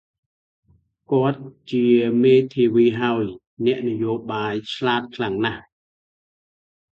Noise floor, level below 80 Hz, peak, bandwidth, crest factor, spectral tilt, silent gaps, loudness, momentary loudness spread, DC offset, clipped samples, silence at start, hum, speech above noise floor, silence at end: under -90 dBFS; -60 dBFS; -4 dBFS; 7.4 kHz; 16 dB; -7.5 dB/octave; 3.47-3.57 s; -21 LUFS; 10 LU; under 0.1%; under 0.1%; 1.1 s; none; over 70 dB; 1.35 s